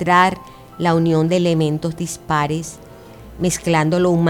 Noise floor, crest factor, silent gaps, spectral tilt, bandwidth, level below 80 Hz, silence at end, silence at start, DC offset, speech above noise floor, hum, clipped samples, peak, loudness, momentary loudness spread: -39 dBFS; 16 dB; none; -5.5 dB/octave; 16 kHz; -46 dBFS; 0 s; 0 s; under 0.1%; 22 dB; none; under 0.1%; -2 dBFS; -18 LUFS; 11 LU